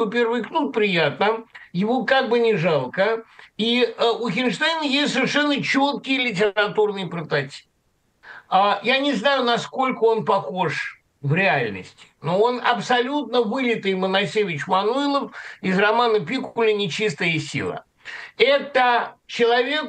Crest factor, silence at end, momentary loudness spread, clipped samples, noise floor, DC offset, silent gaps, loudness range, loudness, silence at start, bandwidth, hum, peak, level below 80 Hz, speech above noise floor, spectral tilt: 18 dB; 0 s; 10 LU; under 0.1%; -66 dBFS; under 0.1%; none; 2 LU; -21 LUFS; 0 s; 9.4 kHz; none; -2 dBFS; -68 dBFS; 45 dB; -5 dB/octave